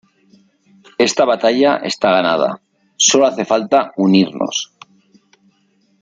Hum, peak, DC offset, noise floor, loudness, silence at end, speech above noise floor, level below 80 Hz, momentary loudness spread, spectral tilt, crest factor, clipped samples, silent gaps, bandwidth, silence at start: none; 0 dBFS; under 0.1%; -59 dBFS; -15 LUFS; 1.4 s; 45 dB; -64 dBFS; 9 LU; -3.5 dB/octave; 16 dB; under 0.1%; none; 9.6 kHz; 1 s